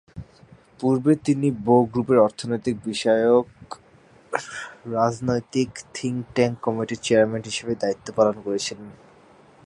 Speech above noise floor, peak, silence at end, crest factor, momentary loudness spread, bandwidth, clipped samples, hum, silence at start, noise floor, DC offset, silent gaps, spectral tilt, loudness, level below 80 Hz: 31 dB; -2 dBFS; 0.75 s; 20 dB; 15 LU; 11.5 kHz; under 0.1%; none; 0.15 s; -53 dBFS; under 0.1%; none; -5.5 dB/octave; -23 LUFS; -58 dBFS